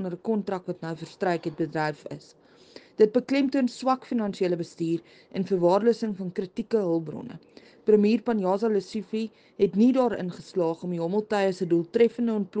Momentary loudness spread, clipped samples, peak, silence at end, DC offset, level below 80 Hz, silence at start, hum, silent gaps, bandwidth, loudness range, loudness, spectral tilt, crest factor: 13 LU; under 0.1%; -8 dBFS; 0 s; under 0.1%; -68 dBFS; 0 s; none; none; 9.2 kHz; 3 LU; -26 LUFS; -7 dB/octave; 18 dB